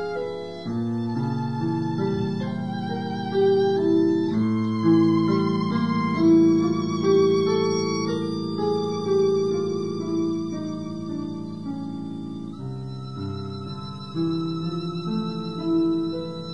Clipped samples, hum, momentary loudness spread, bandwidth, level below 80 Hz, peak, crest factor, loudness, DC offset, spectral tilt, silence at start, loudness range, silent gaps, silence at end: under 0.1%; none; 13 LU; 9.6 kHz; -60 dBFS; -8 dBFS; 16 dB; -24 LUFS; 0.4%; -7.5 dB/octave; 0 s; 10 LU; none; 0 s